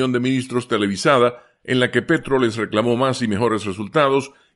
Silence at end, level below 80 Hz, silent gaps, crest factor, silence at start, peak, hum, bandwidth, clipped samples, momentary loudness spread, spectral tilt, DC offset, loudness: 0.25 s; -54 dBFS; none; 16 dB; 0 s; -2 dBFS; none; 11.5 kHz; under 0.1%; 6 LU; -5.5 dB/octave; under 0.1%; -19 LUFS